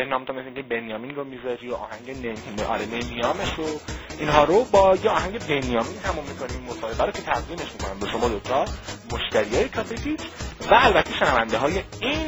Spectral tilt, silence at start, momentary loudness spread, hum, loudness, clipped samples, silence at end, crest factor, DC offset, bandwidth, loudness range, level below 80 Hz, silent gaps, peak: -4.5 dB/octave; 0 s; 15 LU; none; -24 LUFS; under 0.1%; 0 s; 22 dB; under 0.1%; over 20 kHz; 7 LU; -40 dBFS; none; -2 dBFS